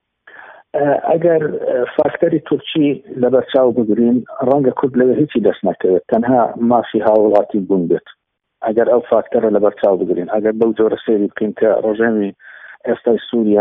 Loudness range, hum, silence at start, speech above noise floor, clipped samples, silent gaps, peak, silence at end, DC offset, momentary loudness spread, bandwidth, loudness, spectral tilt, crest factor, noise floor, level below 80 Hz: 2 LU; none; 0.4 s; 26 dB; under 0.1%; none; 0 dBFS; 0 s; under 0.1%; 5 LU; 3.9 kHz; -15 LUFS; -6 dB/octave; 14 dB; -41 dBFS; -58 dBFS